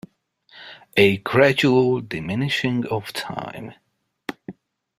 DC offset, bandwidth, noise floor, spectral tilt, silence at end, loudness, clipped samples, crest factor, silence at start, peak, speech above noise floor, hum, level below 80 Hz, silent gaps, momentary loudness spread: under 0.1%; 15.5 kHz; -58 dBFS; -6 dB/octave; 0.45 s; -20 LUFS; under 0.1%; 20 dB; 0.55 s; -2 dBFS; 38 dB; none; -58 dBFS; none; 23 LU